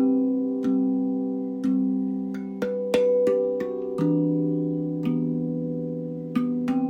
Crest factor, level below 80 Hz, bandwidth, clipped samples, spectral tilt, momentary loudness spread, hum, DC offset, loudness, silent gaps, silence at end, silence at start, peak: 16 dB; -64 dBFS; 8.8 kHz; under 0.1%; -9 dB/octave; 8 LU; none; under 0.1%; -25 LUFS; none; 0 s; 0 s; -8 dBFS